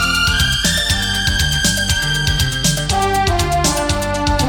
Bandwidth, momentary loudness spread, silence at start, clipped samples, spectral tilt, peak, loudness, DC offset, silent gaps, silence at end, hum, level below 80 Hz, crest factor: 19 kHz; 3 LU; 0 s; under 0.1%; -3 dB/octave; -2 dBFS; -15 LUFS; under 0.1%; none; 0 s; none; -24 dBFS; 14 dB